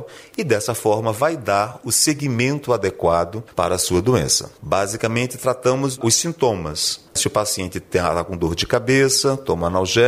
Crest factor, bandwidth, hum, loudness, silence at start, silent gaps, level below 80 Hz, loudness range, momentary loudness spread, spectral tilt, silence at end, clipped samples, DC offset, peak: 16 dB; 16 kHz; none; -19 LUFS; 0 s; none; -44 dBFS; 1 LU; 6 LU; -3.5 dB/octave; 0 s; under 0.1%; under 0.1%; -4 dBFS